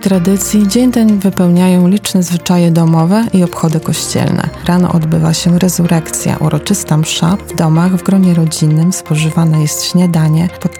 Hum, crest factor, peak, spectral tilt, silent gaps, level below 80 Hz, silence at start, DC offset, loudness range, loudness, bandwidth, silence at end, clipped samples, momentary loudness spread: none; 10 dB; 0 dBFS; -6 dB/octave; none; -38 dBFS; 0 s; under 0.1%; 2 LU; -11 LUFS; 18 kHz; 0 s; under 0.1%; 4 LU